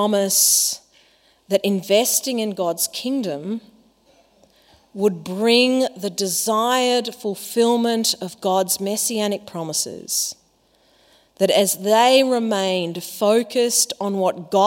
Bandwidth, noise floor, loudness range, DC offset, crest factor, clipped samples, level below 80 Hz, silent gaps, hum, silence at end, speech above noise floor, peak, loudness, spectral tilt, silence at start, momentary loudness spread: 16.5 kHz; -60 dBFS; 5 LU; under 0.1%; 18 dB; under 0.1%; -72 dBFS; none; none; 0 s; 40 dB; -2 dBFS; -19 LUFS; -2.5 dB/octave; 0 s; 10 LU